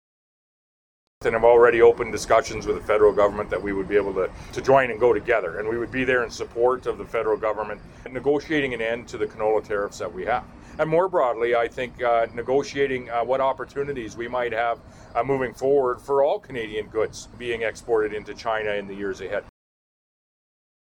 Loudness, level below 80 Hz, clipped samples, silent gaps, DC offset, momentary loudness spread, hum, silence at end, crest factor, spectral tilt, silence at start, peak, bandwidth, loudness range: -23 LUFS; -48 dBFS; under 0.1%; none; under 0.1%; 12 LU; none; 1.55 s; 20 dB; -5 dB/octave; 1.2 s; -4 dBFS; 12 kHz; 6 LU